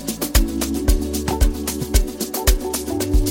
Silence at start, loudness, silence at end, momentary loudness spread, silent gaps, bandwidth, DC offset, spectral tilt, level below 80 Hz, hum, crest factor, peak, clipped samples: 0 s; -21 LUFS; 0 s; 3 LU; none; 17 kHz; under 0.1%; -4.5 dB/octave; -20 dBFS; none; 18 dB; 0 dBFS; under 0.1%